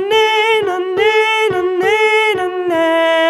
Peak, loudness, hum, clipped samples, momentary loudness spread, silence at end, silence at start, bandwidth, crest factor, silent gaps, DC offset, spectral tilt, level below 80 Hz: -2 dBFS; -13 LUFS; none; under 0.1%; 4 LU; 0 s; 0 s; 13 kHz; 12 dB; none; under 0.1%; -3 dB/octave; -58 dBFS